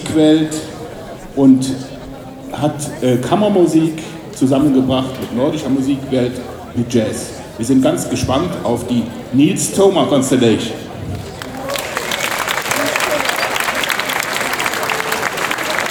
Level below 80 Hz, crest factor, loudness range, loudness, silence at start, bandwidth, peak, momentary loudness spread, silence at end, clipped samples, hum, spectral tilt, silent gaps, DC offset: -44 dBFS; 16 dB; 2 LU; -16 LUFS; 0 s; over 20 kHz; 0 dBFS; 14 LU; 0 s; under 0.1%; none; -4.5 dB/octave; none; under 0.1%